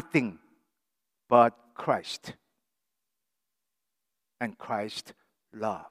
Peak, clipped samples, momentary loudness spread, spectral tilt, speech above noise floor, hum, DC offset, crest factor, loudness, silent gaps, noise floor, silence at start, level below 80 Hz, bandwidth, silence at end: -6 dBFS; under 0.1%; 17 LU; -5.5 dB/octave; 58 dB; none; under 0.1%; 26 dB; -29 LUFS; none; -86 dBFS; 0 s; -78 dBFS; 15.5 kHz; 0.05 s